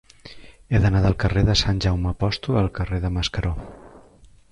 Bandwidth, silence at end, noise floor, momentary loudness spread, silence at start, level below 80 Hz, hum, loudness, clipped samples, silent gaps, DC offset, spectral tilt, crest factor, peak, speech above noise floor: 9.8 kHz; 0.55 s; -50 dBFS; 8 LU; 0.25 s; -32 dBFS; none; -22 LUFS; under 0.1%; none; under 0.1%; -6 dB/octave; 18 dB; -4 dBFS; 30 dB